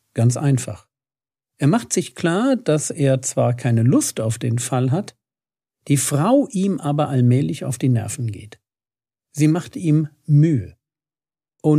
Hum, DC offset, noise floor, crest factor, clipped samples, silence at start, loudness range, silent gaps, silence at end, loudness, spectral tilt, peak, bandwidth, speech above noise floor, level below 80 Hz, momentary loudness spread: none; under 0.1%; under -90 dBFS; 16 dB; under 0.1%; 0.15 s; 2 LU; none; 0 s; -19 LUFS; -6.5 dB/octave; -4 dBFS; 15 kHz; over 72 dB; -62 dBFS; 8 LU